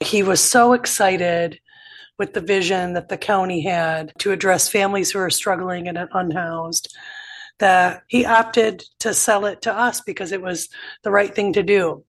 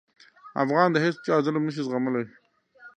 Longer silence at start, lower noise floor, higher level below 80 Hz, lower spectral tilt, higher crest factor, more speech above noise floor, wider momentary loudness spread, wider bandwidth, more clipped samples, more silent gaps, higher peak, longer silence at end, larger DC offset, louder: second, 0 s vs 0.45 s; second, -45 dBFS vs -53 dBFS; first, -58 dBFS vs -76 dBFS; second, -3 dB/octave vs -7 dB/octave; about the same, 18 dB vs 20 dB; about the same, 26 dB vs 28 dB; about the same, 12 LU vs 10 LU; first, 12.5 kHz vs 9.2 kHz; neither; neither; first, -2 dBFS vs -6 dBFS; about the same, 0.1 s vs 0.1 s; neither; first, -19 LUFS vs -25 LUFS